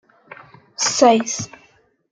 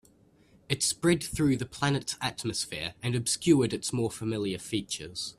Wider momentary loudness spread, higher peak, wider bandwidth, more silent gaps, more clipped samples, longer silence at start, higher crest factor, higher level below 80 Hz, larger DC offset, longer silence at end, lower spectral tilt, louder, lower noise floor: first, 20 LU vs 9 LU; first, -2 dBFS vs -8 dBFS; second, 10 kHz vs 14 kHz; neither; neither; about the same, 0.8 s vs 0.7 s; about the same, 18 dB vs 22 dB; second, -64 dBFS vs -56 dBFS; neither; first, 0.65 s vs 0.05 s; second, -2.5 dB/octave vs -4 dB/octave; first, -17 LUFS vs -29 LUFS; second, -57 dBFS vs -61 dBFS